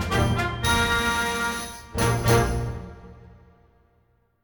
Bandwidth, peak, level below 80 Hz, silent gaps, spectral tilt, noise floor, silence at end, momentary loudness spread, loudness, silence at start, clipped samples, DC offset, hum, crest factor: over 20 kHz; -8 dBFS; -36 dBFS; none; -4.5 dB/octave; -65 dBFS; 1.15 s; 12 LU; -23 LUFS; 0 s; under 0.1%; under 0.1%; none; 18 dB